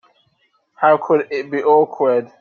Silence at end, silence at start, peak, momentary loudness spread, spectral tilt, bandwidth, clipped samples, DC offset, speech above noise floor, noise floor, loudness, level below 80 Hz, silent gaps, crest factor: 0.15 s; 0.8 s; -2 dBFS; 5 LU; -7.5 dB/octave; 6.6 kHz; under 0.1%; under 0.1%; 47 dB; -63 dBFS; -16 LUFS; -68 dBFS; none; 16 dB